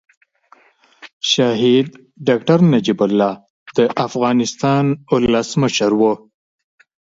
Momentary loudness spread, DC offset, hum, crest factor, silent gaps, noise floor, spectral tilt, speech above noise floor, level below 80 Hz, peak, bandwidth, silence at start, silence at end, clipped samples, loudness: 9 LU; under 0.1%; none; 16 dB; 1.13-1.20 s, 3.50-3.66 s; -52 dBFS; -5.5 dB/octave; 37 dB; -52 dBFS; 0 dBFS; 7.8 kHz; 1.05 s; 0.85 s; under 0.1%; -16 LUFS